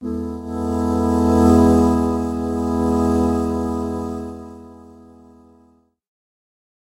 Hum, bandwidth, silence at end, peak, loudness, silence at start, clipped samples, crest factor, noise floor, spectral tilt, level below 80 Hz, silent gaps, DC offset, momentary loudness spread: none; 15.5 kHz; 2.05 s; -2 dBFS; -18 LUFS; 0 s; under 0.1%; 18 dB; -56 dBFS; -8 dB/octave; -34 dBFS; none; under 0.1%; 15 LU